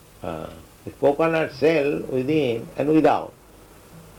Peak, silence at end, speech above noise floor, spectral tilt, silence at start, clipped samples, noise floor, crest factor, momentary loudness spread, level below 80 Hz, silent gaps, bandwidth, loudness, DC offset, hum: -8 dBFS; 0.15 s; 27 dB; -7 dB/octave; 0.25 s; under 0.1%; -48 dBFS; 14 dB; 20 LU; -52 dBFS; none; 18 kHz; -22 LUFS; under 0.1%; none